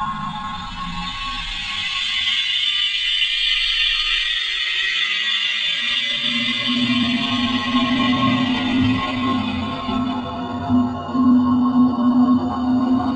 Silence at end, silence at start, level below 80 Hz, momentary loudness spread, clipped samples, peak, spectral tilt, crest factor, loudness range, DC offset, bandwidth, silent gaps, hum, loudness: 0 s; 0 s; -42 dBFS; 9 LU; under 0.1%; -6 dBFS; -4 dB/octave; 14 dB; 3 LU; under 0.1%; 9 kHz; none; none; -18 LUFS